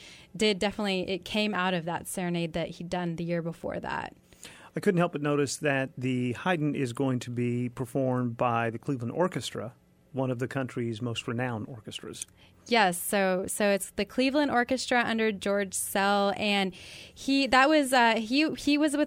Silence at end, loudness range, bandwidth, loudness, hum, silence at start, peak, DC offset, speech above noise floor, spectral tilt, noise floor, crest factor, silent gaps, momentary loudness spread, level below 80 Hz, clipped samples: 0 s; 7 LU; 16 kHz; -28 LUFS; none; 0 s; -10 dBFS; under 0.1%; 22 dB; -4.5 dB/octave; -50 dBFS; 18 dB; none; 13 LU; -60 dBFS; under 0.1%